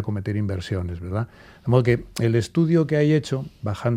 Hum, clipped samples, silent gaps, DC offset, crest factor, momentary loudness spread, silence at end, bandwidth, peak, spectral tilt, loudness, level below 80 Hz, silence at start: none; under 0.1%; none; under 0.1%; 18 dB; 10 LU; 0 s; 15 kHz; -4 dBFS; -7.5 dB/octave; -23 LUFS; -50 dBFS; 0 s